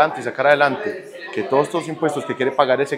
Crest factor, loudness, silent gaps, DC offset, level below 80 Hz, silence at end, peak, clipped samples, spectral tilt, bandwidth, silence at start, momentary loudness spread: 18 dB; -20 LUFS; none; under 0.1%; -72 dBFS; 0 s; 0 dBFS; under 0.1%; -5 dB/octave; 13.5 kHz; 0 s; 12 LU